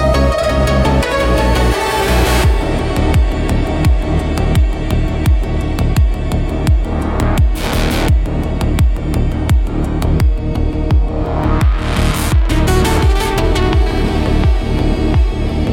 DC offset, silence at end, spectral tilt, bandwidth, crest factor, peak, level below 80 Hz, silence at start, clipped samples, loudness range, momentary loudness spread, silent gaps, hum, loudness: under 0.1%; 0 s; -6 dB/octave; 17 kHz; 12 dB; 0 dBFS; -16 dBFS; 0 s; under 0.1%; 2 LU; 4 LU; none; none; -15 LUFS